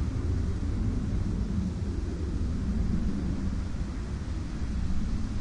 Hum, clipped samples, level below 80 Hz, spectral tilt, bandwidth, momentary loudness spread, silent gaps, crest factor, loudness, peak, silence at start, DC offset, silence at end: none; under 0.1%; -32 dBFS; -7.5 dB/octave; 10.5 kHz; 4 LU; none; 12 dB; -32 LUFS; -16 dBFS; 0 s; under 0.1%; 0 s